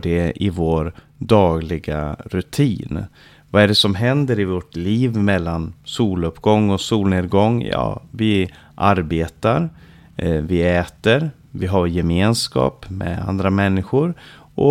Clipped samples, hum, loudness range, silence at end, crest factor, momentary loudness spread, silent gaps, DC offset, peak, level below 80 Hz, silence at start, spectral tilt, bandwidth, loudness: under 0.1%; none; 2 LU; 0 s; 16 dB; 11 LU; none; under 0.1%; -2 dBFS; -38 dBFS; 0.05 s; -6.5 dB/octave; 15.5 kHz; -19 LUFS